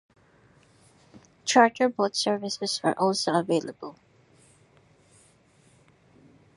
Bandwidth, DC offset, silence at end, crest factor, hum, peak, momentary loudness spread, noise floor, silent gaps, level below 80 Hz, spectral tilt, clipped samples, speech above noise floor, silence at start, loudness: 11.5 kHz; under 0.1%; 2.65 s; 24 dB; none; -4 dBFS; 16 LU; -60 dBFS; none; -74 dBFS; -3.5 dB/octave; under 0.1%; 36 dB; 1.15 s; -25 LUFS